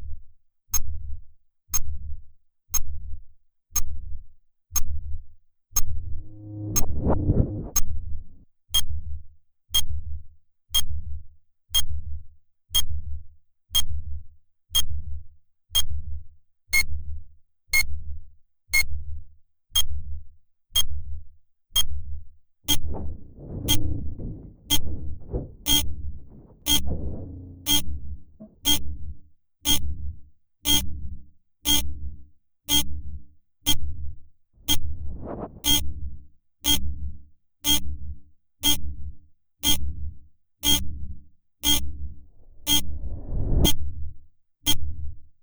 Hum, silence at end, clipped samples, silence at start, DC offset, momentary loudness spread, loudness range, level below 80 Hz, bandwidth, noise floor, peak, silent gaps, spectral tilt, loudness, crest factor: none; 0.2 s; under 0.1%; 0 s; under 0.1%; 20 LU; 4 LU; -34 dBFS; over 20 kHz; -48 dBFS; -4 dBFS; none; -2 dB/octave; -25 LUFS; 18 dB